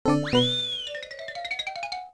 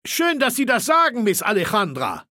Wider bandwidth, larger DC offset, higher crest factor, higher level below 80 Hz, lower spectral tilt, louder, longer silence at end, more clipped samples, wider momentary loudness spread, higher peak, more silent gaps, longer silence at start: second, 11 kHz vs 17 kHz; neither; about the same, 18 dB vs 16 dB; first, -54 dBFS vs -62 dBFS; first, -5 dB/octave vs -3 dB/octave; second, -27 LUFS vs -19 LUFS; about the same, 0 s vs 0.1 s; neither; first, 13 LU vs 5 LU; second, -10 dBFS vs -4 dBFS; neither; about the same, 0.05 s vs 0.05 s